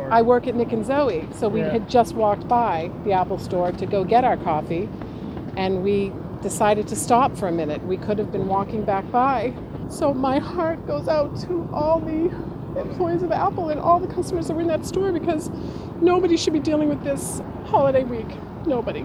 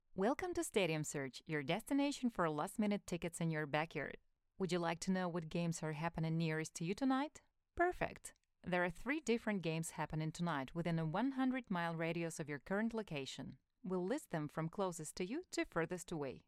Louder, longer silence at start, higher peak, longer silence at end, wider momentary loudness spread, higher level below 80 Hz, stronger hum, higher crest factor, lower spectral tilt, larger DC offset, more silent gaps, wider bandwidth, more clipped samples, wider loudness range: first, -22 LUFS vs -41 LUFS; second, 0 s vs 0.15 s; first, -4 dBFS vs -22 dBFS; about the same, 0 s vs 0.1 s; first, 10 LU vs 7 LU; first, -44 dBFS vs -66 dBFS; neither; about the same, 18 dB vs 18 dB; about the same, -6 dB/octave vs -5.5 dB/octave; neither; neither; about the same, 14.5 kHz vs 15 kHz; neither; about the same, 2 LU vs 3 LU